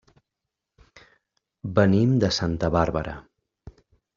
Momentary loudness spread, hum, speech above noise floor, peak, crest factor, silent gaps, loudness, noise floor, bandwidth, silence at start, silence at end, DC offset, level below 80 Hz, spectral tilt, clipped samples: 17 LU; none; 63 dB; -4 dBFS; 22 dB; none; -22 LUFS; -84 dBFS; 7.4 kHz; 1.65 s; 0.45 s; under 0.1%; -46 dBFS; -6 dB/octave; under 0.1%